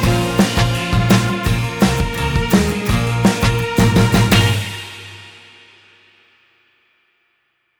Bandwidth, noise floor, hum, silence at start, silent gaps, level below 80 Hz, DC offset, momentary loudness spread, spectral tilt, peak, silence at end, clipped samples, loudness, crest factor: over 20 kHz; -66 dBFS; none; 0 s; none; -28 dBFS; under 0.1%; 13 LU; -5.5 dB/octave; -4 dBFS; 2.5 s; under 0.1%; -16 LUFS; 14 dB